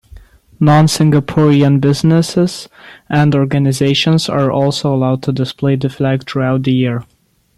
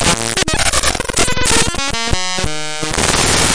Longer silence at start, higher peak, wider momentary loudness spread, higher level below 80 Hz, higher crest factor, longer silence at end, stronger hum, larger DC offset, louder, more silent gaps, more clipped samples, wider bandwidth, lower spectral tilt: first, 0.15 s vs 0 s; about the same, 0 dBFS vs 0 dBFS; about the same, 7 LU vs 7 LU; second, -46 dBFS vs -26 dBFS; about the same, 12 dB vs 16 dB; first, 0.55 s vs 0 s; neither; second, under 0.1% vs 7%; about the same, -13 LUFS vs -14 LUFS; neither; neither; first, 13 kHz vs 10.5 kHz; first, -6.5 dB/octave vs -2 dB/octave